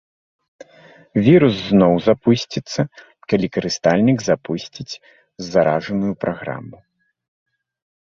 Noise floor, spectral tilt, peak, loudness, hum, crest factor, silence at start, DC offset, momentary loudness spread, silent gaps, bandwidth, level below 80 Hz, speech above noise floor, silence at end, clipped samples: -48 dBFS; -6.5 dB/octave; -2 dBFS; -18 LUFS; none; 18 dB; 1.15 s; under 0.1%; 18 LU; none; 7.4 kHz; -52 dBFS; 30 dB; 1.3 s; under 0.1%